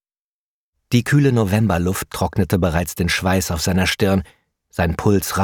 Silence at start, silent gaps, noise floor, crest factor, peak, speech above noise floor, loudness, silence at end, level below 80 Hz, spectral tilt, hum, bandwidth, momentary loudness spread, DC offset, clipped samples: 0.9 s; none; under -90 dBFS; 16 dB; -2 dBFS; over 72 dB; -19 LUFS; 0 s; -36 dBFS; -5.5 dB/octave; none; 19 kHz; 7 LU; under 0.1%; under 0.1%